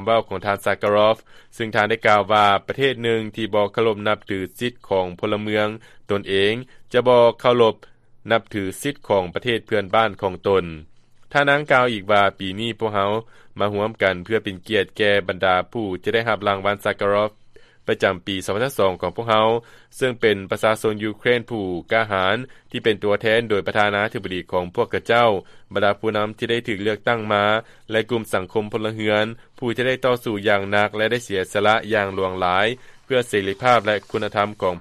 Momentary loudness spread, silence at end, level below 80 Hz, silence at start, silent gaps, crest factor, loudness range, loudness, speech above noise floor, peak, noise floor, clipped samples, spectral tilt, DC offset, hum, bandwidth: 9 LU; 0 s; -54 dBFS; 0 s; none; 18 dB; 3 LU; -21 LUFS; 27 dB; -2 dBFS; -47 dBFS; under 0.1%; -5 dB/octave; under 0.1%; none; 14 kHz